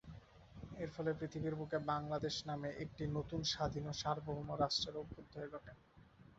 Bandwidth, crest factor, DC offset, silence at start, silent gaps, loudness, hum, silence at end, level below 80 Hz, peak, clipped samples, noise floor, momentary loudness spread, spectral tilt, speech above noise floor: 8 kHz; 20 dB; under 0.1%; 0.05 s; none; -42 LUFS; none; 0.05 s; -62 dBFS; -22 dBFS; under 0.1%; -64 dBFS; 16 LU; -4.5 dB/octave; 22 dB